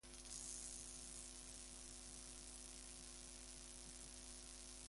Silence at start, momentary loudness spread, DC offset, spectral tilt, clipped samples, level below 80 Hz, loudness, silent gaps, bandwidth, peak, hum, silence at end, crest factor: 0.05 s; 5 LU; under 0.1%; -1.5 dB/octave; under 0.1%; -64 dBFS; -53 LUFS; none; 11.5 kHz; -32 dBFS; none; 0 s; 24 dB